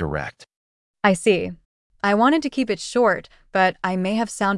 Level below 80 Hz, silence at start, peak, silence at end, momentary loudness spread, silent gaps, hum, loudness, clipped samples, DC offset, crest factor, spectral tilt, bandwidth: -50 dBFS; 0 s; -4 dBFS; 0 s; 10 LU; 0.56-0.94 s, 1.65-1.90 s; none; -21 LUFS; under 0.1%; under 0.1%; 18 dB; -5 dB/octave; 12 kHz